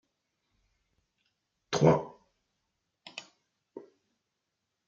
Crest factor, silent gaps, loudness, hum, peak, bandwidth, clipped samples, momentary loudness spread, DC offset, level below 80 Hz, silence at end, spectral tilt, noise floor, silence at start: 26 dB; none; -27 LUFS; none; -10 dBFS; 7.6 kHz; under 0.1%; 26 LU; under 0.1%; -66 dBFS; 1.1 s; -6 dB/octave; -84 dBFS; 1.7 s